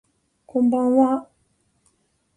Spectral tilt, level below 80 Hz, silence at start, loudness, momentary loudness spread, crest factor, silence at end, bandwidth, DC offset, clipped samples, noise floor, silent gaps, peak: -8 dB/octave; -64 dBFS; 0.55 s; -20 LUFS; 10 LU; 18 dB; 1.15 s; 9.8 kHz; under 0.1%; under 0.1%; -67 dBFS; none; -6 dBFS